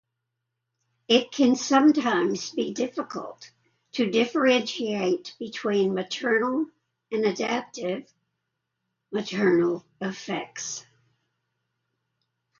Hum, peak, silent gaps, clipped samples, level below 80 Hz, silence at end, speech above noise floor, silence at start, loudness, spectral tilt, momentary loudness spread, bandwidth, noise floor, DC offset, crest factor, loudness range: none; -6 dBFS; none; under 0.1%; -74 dBFS; 1.8 s; 57 dB; 1.1 s; -25 LUFS; -4 dB/octave; 14 LU; 7.6 kHz; -82 dBFS; under 0.1%; 22 dB; 5 LU